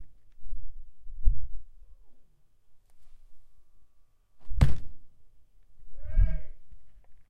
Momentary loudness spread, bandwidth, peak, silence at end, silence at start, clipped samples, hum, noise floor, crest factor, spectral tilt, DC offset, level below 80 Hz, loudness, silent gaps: 26 LU; 5.2 kHz; -8 dBFS; 0.1 s; 0 s; under 0.1%; none; -56 dBFS; 20 dB; -7.5 dB/octave; under 0.1%; -34 dBFS; -32 LUFS; none